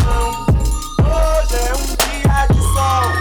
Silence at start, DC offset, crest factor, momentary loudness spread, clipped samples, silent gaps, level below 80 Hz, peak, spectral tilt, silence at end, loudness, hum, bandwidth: 0 s; under 0.1%; 6 dB; 4 LU; under 0.1%; none; -18 dBFS; -8 dBFS; -5 dB/octave; 0 s; -16 LUFS; none; over 20 kHz